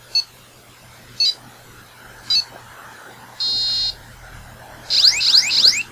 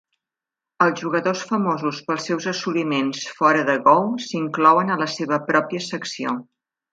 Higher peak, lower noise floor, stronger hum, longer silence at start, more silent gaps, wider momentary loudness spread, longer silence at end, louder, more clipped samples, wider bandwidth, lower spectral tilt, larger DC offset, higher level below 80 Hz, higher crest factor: about the same, 0 dBFS vs -2 dBFS; second, -46 dBFS vs -88 dBFS; neither; second, 0.15 s vs 0.8 s; neither; first, 21 LU vs 11 LU; second, 0.05 s vs 0.5 s; first, -15 LUFS vs -21 LUFS; neither; first, 16 kHz vs 9.2 kHz; second, 1 dB/octave vs -5 dB/octave; neither; first, -52 dBFS vs -72 dBFS; about the same, 20 dB vs 20 dB